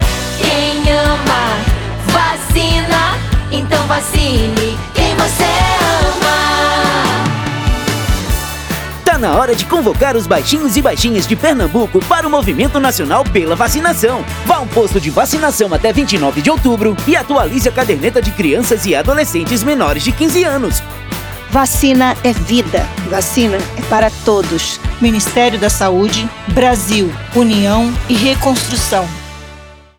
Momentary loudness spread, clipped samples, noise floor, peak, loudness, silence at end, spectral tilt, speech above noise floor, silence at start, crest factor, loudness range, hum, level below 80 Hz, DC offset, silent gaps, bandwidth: 5 LU; under 0.1%; -35 dBFS; 0 dBFS; -13 LUFS; 0.25 s; -4.5 dB/octave; 23 dB; 0 s; 12 dB; 1 LU; none; -24 dBFS; under 0.1%; none; over 20 kHz